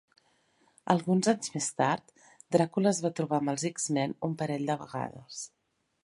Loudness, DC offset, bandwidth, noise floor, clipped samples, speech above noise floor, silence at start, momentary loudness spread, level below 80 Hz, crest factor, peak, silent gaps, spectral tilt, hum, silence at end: -30 LUFS; under 0.1%; 11.5 kHz; -69 dBFS; under 0.1%; 39 dB; 0.85 s; 13 LU; -74 dBFS; 24 dB; -8 dBFS; none; -5 dB/octave; none; 0.55 s